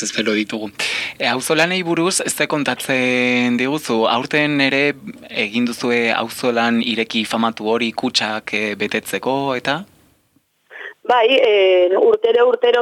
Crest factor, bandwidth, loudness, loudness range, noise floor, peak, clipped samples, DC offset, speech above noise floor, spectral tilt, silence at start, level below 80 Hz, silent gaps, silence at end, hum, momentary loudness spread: 16 dB; 15.5 kHz; -17 LUFS; 4 LU; -61 dBFS; -2 dBFS; under 0.1%; under 0.1%; 44 dB; -3.5 dB/octave; 0 s; -64 dBFS; none; 0 s; none; 8 LU